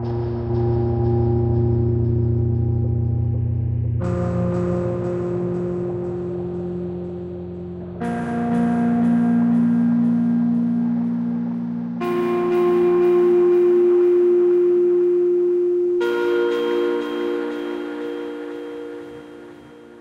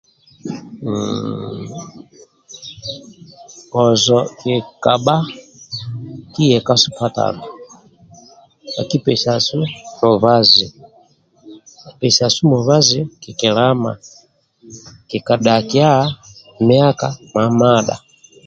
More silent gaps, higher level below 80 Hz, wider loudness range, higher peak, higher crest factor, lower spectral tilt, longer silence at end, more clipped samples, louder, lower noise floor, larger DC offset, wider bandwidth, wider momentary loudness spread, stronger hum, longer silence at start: neither; first, -40 dBFS vs -54 dBFS; first, 9 LU vs 5 LU; second, -10 dBFS vs 0 dBFS; second, 10 dB vs 18 dB; first, -9.5 dB/octave vs -5 dB/octave; second, 0 s vs 0.5 s; neither; second, -20 LUFS vs -15 LUFS; second, -42 dBFS vs -52 dBFS; neither; second, 5.4 kHz vs 9 kHz; second, 14 LU vs 18 LU; neither; second, 0 s vs 0.45 s